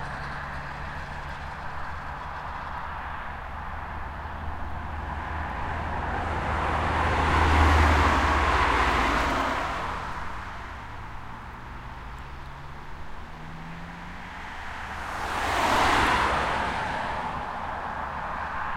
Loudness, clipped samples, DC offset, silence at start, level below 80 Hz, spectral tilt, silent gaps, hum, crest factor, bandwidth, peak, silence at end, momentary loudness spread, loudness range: -27 LUFS; under 0.1%; under 0.1%; 0 s; -36 dBFS; -5 dB/octave; none; none; 20 dB; 15.5 kHz; -8 dBFS; 0 s; 19 LU; 17 LU